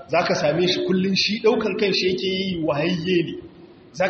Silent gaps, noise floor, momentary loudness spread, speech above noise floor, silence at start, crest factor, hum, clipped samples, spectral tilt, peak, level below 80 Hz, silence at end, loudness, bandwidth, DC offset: none; -45 dBFS; 5 LU; 24 dB; 0 s; 16 dB; none; under 0.1%; -3.5 dB/octave; -6 dBFS; -56 dBFS; 0 s; -21 LUFS; 6.8 kHz; under 0.1%